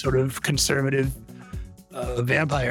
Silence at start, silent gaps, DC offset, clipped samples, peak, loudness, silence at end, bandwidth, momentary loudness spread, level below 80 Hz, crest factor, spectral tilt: 0 s; none; under 0.1%; under 0.1%; -6 dBFS; -24 LUFS; 0 s; 18.5 kHz; 18 LU; -40 dBFS; 18 dB; -4.5 dB/octave